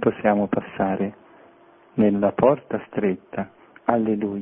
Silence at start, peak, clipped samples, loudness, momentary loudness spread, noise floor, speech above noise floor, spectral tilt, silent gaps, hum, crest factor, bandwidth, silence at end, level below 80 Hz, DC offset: 0 s; -2 dBFS; under 0.1%; -23 LUFS; 12 LU; -52 dBFS; 31 dB; -11.5 dB/octave; none; none; 22 dB; 3.7 kHz; 0 s; -58 dBFS; under 0.1%